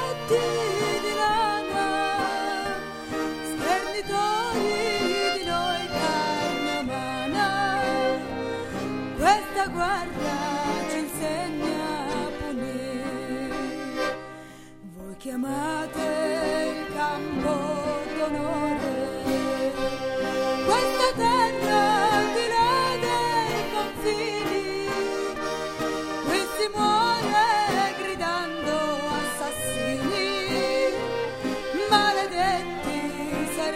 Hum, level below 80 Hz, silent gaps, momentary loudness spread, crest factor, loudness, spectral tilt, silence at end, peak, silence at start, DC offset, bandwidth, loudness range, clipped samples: none; -48 dBFS; none; 9 LU; 20 dB; -26 LUFS; -3.5 dB/octave; 0 s; -6 dBFS; 0 s; under 0.1%; 16 kHz; 6 LU; under 0.1%